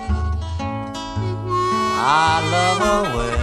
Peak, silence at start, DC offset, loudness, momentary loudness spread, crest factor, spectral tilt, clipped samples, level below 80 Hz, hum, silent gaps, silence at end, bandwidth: -4 dBFS; 0 s; under 0.1%; -19 LUFS; 10 LU; 16 dB; -4.5 dB/octave; under 0.1%; -30 dBFS; none; none; 0 s; 13.5 kHz